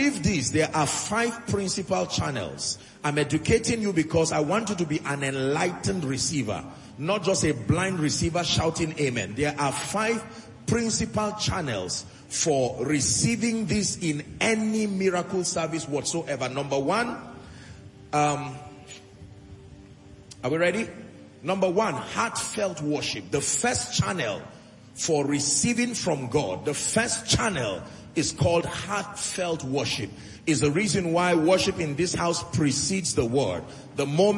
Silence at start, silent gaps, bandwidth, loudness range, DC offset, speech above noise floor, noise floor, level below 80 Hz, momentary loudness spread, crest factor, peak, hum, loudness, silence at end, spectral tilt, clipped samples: 0 s; none; 11.5 kHz; 4 LU; under 0.1%; 22 dB; -48 dBFS; -52 dBFS; 9 LU; 18 dB; -8 dBFS; none; -26 LUFS; 0 s; -4 dB/octave; under 0.1%